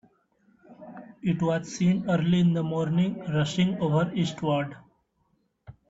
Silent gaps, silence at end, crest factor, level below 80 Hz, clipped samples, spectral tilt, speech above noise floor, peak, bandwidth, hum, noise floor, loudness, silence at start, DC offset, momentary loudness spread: none; 0.15 s; 14 dB; -60 dBFS; under 0.1%; -7 dB/octave; 46 dB; -12 dBFS; 8 kHz; none; -71 dBFS; -26 LUFS; 0.7 s; under 0.1%; 10 LU